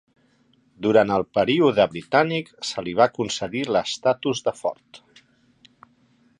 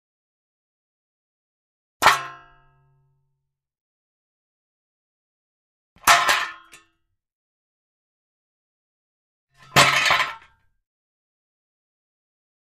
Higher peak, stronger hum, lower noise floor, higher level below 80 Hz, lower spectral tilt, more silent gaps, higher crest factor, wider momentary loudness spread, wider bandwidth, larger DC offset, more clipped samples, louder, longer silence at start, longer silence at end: second, -4 dBFS vs 0 dBFS; neither; second, -62 dBFS vs -78 dBFS; about the same, -60 dBFS vs -60 dBFS; first, -5 dB/octave vs -1 dB/octave; second, none vs 3.81-5.96 s, 7.35-9.47 s; second, 20 dB vs 28 dB; about the same, 10 LU vs 12 LU; second, 11 kHz vs 15.5 kHz; neither; neither; second, -22 LUFS vs -18 LUFS; second, 0.8 s vs 2 s; second, 1.4 s vs 2.4 s